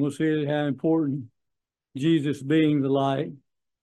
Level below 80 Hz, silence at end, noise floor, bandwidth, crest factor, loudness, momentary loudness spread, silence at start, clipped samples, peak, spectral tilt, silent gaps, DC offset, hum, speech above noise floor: -70 dBFS; 0.45 s; -84 dBFS; 10.5 kHz; 14 dB; -25 LUFS; 9 LU; 0 s; under 0.1%; -10 dBFS; -7.5 dB/octave; none; under 0.1%; none; 60 dB